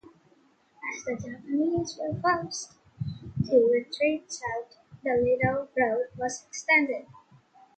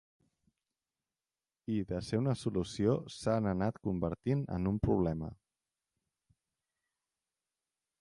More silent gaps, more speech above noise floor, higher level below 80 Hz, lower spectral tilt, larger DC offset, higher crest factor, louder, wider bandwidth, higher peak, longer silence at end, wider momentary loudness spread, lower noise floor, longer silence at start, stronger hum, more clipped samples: neither; second, 36 dB vs over 57 dB; about the same, -58 dBFS vs -54 dBFS; second, -5 dB/octave vs -7.5 dB/octave; neither; about the same, 20 dB vs 20 dB; first, -28 LUFS vs -34 LUFS; second, 9.2 kHz vs 11.5 kHz; first, -10 dBFS vs -16 dBFS; second, 0.6 s vs 2.65 s; first, 15 LU vs 6 LU; second, -63 dBFS vs under -90 dBFS; second, 0.8 s vs 1.7 s; neither; neither